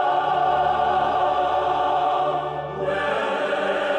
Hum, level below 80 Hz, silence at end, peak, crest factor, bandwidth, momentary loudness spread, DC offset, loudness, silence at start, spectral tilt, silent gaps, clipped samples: none; -50 dBFS; 0 s; -10 dBFS; 12 dB; 9.2 kHz; 5 LU; under 0.1%; -22 LUFS; 0 s; -5 dB/octave; none; under 0.1%